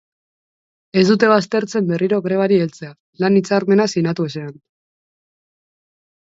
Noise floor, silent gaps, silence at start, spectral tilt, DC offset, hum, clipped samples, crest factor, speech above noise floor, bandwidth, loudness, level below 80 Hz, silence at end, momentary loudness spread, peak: under -90 dBFS; 3.00-3.13 s; 0.95 s; -6.5 dB/octave; under 0.1%; none; under 0.1%; 18 dB; over 73 dB; 7.8 kHz; -17 LUFS; -64 dBFS; 1.85 s; 13 LU; 0 dBFS